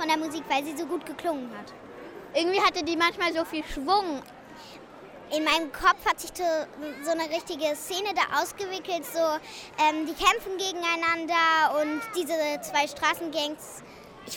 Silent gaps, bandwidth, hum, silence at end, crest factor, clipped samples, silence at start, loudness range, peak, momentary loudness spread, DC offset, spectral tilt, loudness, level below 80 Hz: none; 17.5 kHz; none; 0 s; 20 dB; under 0.1%; 0 s; 3 LU; -8 dBFS; 20 LU; under 0.1%; -2 dB/octave; -27 LUFS; -56 dBFS